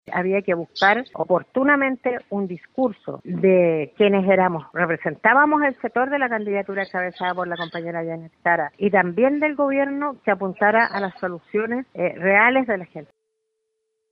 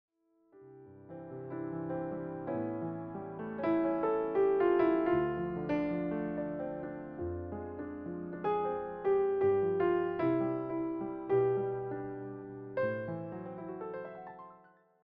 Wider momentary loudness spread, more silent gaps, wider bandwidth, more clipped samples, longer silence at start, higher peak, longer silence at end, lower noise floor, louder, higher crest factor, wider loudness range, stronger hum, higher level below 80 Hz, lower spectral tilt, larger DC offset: second, 11 LU vs 14 LU; neither; first, 6.2 kHz vs 5 kHz; neither; second, 0.1 s vs 0.55 s; first, -4 dBFS vs -18 dBFS; first, 1.05 s vs 0.5 s; first, -76 dBFS vs -65 dBFS; first, -21 LUFS vs -34 LUFS; about the same, 18 dB vs 16 dB; second, 4 LU vs 8 LU; neither; about the same, -66 dBFS vs -64 dBFS; about the same, -8 dB/octave vs -7.5 dB/octave; neither